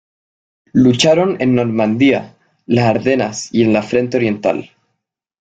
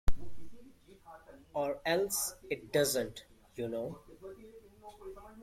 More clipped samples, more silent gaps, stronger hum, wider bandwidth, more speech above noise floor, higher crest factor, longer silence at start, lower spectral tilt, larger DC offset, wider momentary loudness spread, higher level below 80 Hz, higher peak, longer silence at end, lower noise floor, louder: neither; neither; neither; second, 9.2 kHz vs 16.5 kHz; first, 61 dB vs 22 dB; about the same, 16 dB vs 20 dB; first, 0.75 s vs 0.05 s; first, -5.5 dB/octave vs -3 dB/octave; neither; second, 7 LU vs 24 LU; second, -52 dBFS vs -46 dBFS; first, 0 dBFS vs -14 dBFS; first, 0.75 s vs 0 s; first, -74 dBFS vs -57 dBFS; first, -15 LUFS vs -35 LUFS